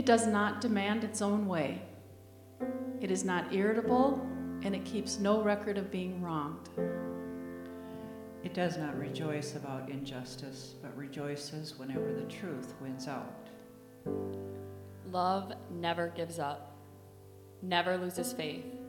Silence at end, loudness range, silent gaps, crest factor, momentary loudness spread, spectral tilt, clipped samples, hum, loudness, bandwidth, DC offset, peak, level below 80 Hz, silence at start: 0 s; 8 LU; none; 22 dB; 16 LU; -5 dB/octave; under 0.1%; none; -35 LUFS; 17.5 kHz; under 0.1%; -12 dBFS; -68 dBFS; 0 s